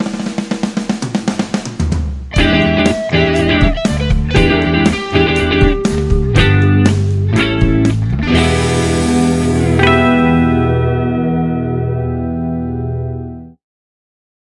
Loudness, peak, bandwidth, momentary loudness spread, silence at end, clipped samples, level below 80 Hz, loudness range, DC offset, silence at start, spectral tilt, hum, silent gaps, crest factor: -14 LUFS; 0 dBFS; 11.5 kHz; 9 LU; 1.05 s; under 0.1%; -24 dBFS; 4 LU; under 0.1%; 0 s; -6 dB/octave; none; none; 14 dB